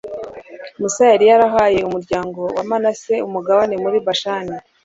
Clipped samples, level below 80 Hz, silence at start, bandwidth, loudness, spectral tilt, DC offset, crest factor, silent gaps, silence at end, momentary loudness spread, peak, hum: under 0.1%; -52 dBFS; 0.05 s; 8 kHz; -16 LUFS; -4 dB/octave; under 0.1%; 14 dB; none; 0.25 s; 18 LU; -2 dBFS; none